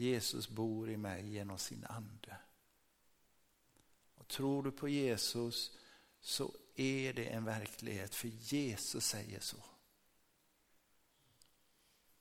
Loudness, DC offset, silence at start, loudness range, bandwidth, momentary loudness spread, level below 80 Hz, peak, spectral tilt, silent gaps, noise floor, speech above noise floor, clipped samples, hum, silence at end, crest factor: -41 LUFS; under 0.1%; 0 s; 8 LU; 17 kHz; 12 LU; -74 dBFS; -24 dBFS; -4 dB/octave; none; -76 dBFS; 35 dB; under 0.1%; none; 2.45 s; 20 dB